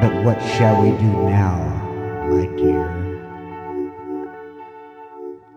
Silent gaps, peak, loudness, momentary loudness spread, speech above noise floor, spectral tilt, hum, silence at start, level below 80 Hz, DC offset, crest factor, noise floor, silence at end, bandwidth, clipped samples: none; -2 dBFS; -19 LUFS; 21 LU; 22 dB; -8 dB/octave; none; 0 s; -40 dBFS; under 0.1%; 18 dB; -39 dBFS; 0.2 s; 8.2 kHz; under 0.1%